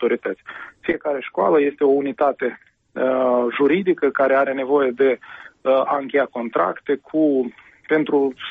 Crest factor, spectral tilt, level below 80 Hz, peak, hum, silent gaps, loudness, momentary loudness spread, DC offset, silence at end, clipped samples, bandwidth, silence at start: 12 dB; -8 dB/octave; -64 dBFS; -6 dBFS; none; none; -20 LUFS; 10 LU; under 0.1%; 0 s; under 0.1%; 4.4 kHz; 0 s